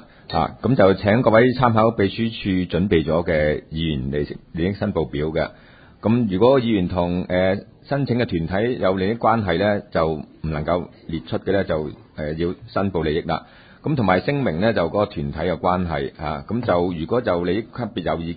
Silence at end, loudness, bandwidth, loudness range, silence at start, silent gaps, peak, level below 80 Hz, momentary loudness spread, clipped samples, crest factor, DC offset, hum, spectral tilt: 0 s; -21 LUFS; 5 kHz; 5 LU; 0.3 s; none; -2 dBFS; -40 dBFS; 10 LU; under 0.1%; 20 dB; under 0.1%; none; -12 dB/octave